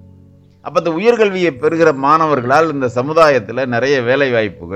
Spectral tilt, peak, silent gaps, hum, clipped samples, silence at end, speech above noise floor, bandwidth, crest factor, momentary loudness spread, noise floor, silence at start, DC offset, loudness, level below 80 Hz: -6 dB/octave; 0 dBFS; none; none; under 0.1%; 0 s; 31 dB; 9.8 kHz; 14 dB; 7 LU; -44 dBFS; 0.65 s; under 0.1%; -14 LUFS; -52 dBFS